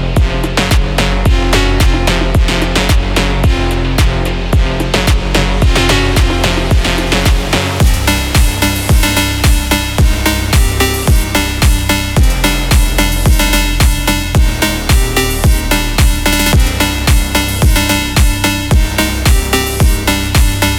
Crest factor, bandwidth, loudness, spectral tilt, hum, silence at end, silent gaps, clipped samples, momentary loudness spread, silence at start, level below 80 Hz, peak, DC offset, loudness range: 10 dB; 18 kHz; -12 LUFS; -4 dB/octave; none; 0 s; none; under 0.1%; 3 LU; 0 s; -14 dBFS; 0 dBFS; under 0.1%; 1 LU